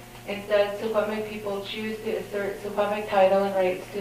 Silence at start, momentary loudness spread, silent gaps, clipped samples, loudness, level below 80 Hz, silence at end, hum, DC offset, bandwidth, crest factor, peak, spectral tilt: 0 s; 11 LU; none; under 0.1%; -26 LUFS; -56 dBFS; 0 s; none; under 0.1%; 15.5 kHz; 18 dB; -8 dBFS; -5 dB/octave